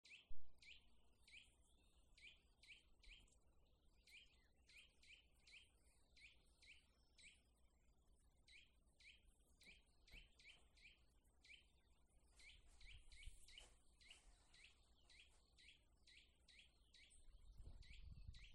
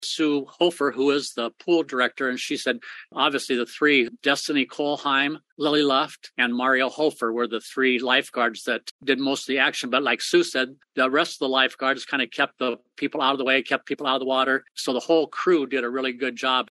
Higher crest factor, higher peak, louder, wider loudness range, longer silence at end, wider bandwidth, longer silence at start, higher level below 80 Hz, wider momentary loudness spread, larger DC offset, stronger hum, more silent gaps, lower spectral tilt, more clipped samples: about the same, 22 dB vs 20 dB; second, -38 dBFS vs -4 dBFS; second, -68 LUFS vs -23 LUFS; about the same, 2 LU vs 1 LU; about the same, 0 s vs 0.05 s; about the same, 11.5 kHz vs 12.5 kHz; about the same, 0.05 s vs 0 s; first, -72 dBFS vs -80 dBFS; second, 4 LU vs 7 LU; neither; neither; second, none vs 5.52-5.57 s, 8.91-8.99 s; about the same, -2 dB/octave vs -3 dB/octave; neither